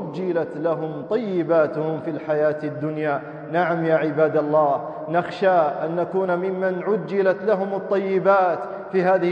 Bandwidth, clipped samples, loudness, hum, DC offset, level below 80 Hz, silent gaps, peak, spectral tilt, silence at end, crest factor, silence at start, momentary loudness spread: 7 kHz; under 0.1%; -22 LUFS; none; under 0.1%; -70 dBFS; none; -6 dBFS; -8.5 dB/octave; 0 s; 16 dB; 0 s; 7 LU